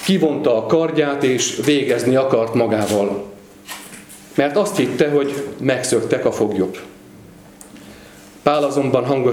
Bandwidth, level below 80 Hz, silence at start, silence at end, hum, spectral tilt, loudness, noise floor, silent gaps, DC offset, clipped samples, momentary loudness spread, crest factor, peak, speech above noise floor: 19 kHz; -58 dBFS; 0 s; 0 s; none; -5 dB/octave; -18 LUFS; -42 dBFS; none; under 0.1%; under 0.1%; 16 LU; 18 dB; 0 dBFS; 25 dB